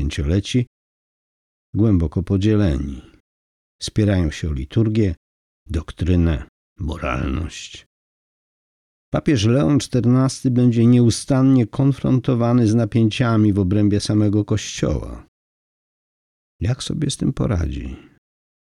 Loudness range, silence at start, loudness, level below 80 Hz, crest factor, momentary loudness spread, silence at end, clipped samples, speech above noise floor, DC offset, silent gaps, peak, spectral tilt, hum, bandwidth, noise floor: 9 LU; 0 s; -19 LUFS; -36 dBFS; 14 dB; 12 LU; 0.6 s; under 0.1%; over 72 dB; under 0.1%; 0.67-1.73 s, 3.20-3.79 s, 5.17-5.66 s, 6.49-6.76 s, 7.86-9.12 s, 15.28-16.59 s; -6 dBFS; -7 dB/octave; none; 11.5 kHz; under -90 dBFS